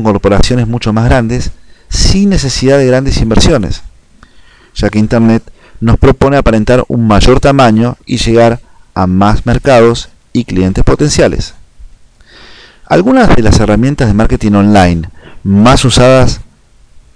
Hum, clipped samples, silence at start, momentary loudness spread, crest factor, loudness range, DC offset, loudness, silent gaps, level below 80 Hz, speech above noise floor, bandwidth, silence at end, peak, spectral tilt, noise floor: none; under 0.1%; 0 s; 11 LU; 8 dB; 3 LU; under 0.1%; -9 LUFS; none; -18 dBFS; 35 dB; 10.5 kHz; 0.15 s; 0 dBFS; -6 dB/octave; -42 dBFS